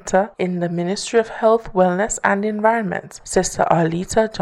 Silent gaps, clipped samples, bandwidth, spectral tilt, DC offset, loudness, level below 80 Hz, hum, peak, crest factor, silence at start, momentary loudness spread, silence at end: none; under 0.1%; 13 kHz; -5 dB/octave; under 0.1%; -19 LUFS; -44 dBFS; none; 0 dBFS; 18 dB; 0.05 s; 5 LU; 0 s